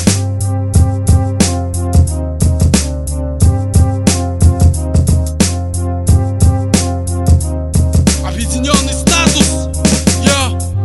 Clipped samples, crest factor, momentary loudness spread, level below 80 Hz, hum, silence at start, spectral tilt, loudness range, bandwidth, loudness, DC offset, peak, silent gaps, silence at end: 0.1%; 12 dB; 6 LU; -18 dBFS; none; 0 s; -5 dB/octave; 1 LU; 12 kHz; -13 LUFS; 0.2%; 0 dBFS; none; 0 s